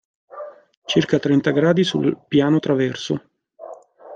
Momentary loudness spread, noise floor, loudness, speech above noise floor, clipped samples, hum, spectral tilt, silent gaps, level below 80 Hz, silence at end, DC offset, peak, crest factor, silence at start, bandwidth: 21 LU; -40 dBFS; -19 LUFS; 22 dB; under 0.1%; none; -6.5 dB/octave; 0.77-0.82 s; -60 dBFS; 0 s; under 0.1%; -4 dBFS; 16 dB; 0.35 s; 9 kHz